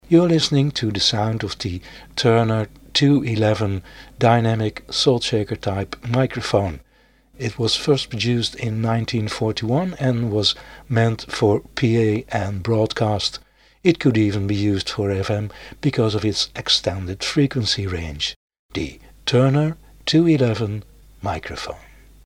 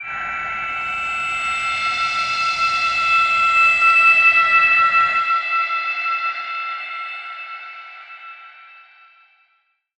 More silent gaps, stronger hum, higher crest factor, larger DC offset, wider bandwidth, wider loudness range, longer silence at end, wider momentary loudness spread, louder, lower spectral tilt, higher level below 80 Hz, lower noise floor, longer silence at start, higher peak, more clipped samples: first, 18.36-18.48 s, 18.59-18.69 s vs none; neither; about the same, 20 dB vs 16 dB; neither; first, 12 kHz vs 10.5 kHz; second, 3 LU vs 17 LU; second, 0.45 s vs 1.35 s; second, 11 LU vs 20 LU; second, -20 LUFS vs -16 LUFS; first, -5.5 dB/octave vs 0 dB/octave; first, -46 dBFS vs -56 dBFS; second, -56 dBFS vs -65 dBFS; about the same, 0.1 s vs 0 s; first, 0 dBFS vs -4 dBFS; neither